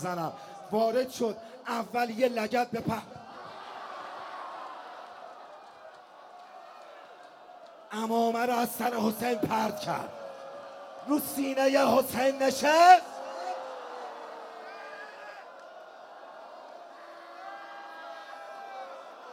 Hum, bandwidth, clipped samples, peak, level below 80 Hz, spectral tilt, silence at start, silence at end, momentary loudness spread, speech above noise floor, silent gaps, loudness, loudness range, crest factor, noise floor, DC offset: none; 16 kHz; under 0.1%; -6 dBFS; -74 dBFS; -4 dB/octave; 0 s; 0 s; 23 LU; 24 dB; none; -28 LUFS; 20 LU; 26 dB; -51 dBFS; under 0.1%